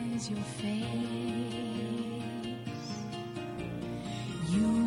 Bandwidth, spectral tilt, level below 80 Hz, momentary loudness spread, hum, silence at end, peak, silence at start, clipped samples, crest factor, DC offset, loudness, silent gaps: 11.5 kHz; -6 dB/octave; -58 dBFS; 6 LU; none; 0 s; -20 dBFS; 0 s; under 0.1%; 16 dB; under 0.1%; -36 LUFS; none